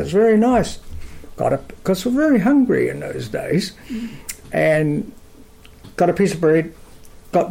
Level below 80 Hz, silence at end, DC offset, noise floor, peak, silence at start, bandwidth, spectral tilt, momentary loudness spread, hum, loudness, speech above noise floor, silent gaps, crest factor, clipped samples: -42 dBFS; 0 s; under 0.1%; -43 dBFS; -6 dBFS; 0 s; 16.5 kHz; -6.5 dB/octave; 17 LU; none; -18 LUFS; 26 dB; none; 14 dB; under 0.1%